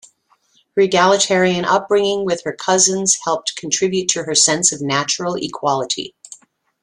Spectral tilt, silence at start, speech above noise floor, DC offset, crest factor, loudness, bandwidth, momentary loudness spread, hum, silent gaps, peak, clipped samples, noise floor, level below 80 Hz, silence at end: -2.5 dB/octave; 0.75 s; 42 dB; under 0.1%; 18 dB; -16 LUFS; 12 kHz; 8 LU; none; none; 0 dBFS; under 0.1%; -59 dBFS; -60 dBFS; 0.5 s